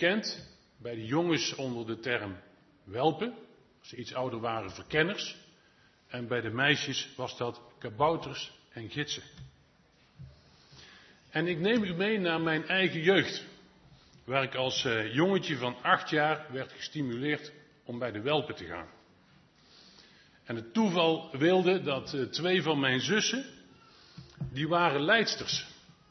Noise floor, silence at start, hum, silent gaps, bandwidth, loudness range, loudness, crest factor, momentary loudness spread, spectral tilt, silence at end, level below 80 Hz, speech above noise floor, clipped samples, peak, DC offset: -64 dBFS; 0 s; none; none; 6.4 kHz; 7 LU; -30 LUFS; 24 dB; 16 LU; -4.5 dB/octave; 0.35 s; -66 dBFS; 34 dB; under 0.1%; -8 dBFS; under 0.1%